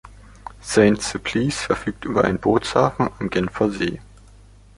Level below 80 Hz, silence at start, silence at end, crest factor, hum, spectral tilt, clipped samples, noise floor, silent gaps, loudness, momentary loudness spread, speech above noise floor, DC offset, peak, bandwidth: -44 dBFS; 0.05 s; 0.75 s; 20 dB; none; -5 dB/octave; under 0.1%; -47 dBFS; none; -21 LUFS; 11 LU; 27 dB; under 0.1%; -2 dBFS; 11.5 kHz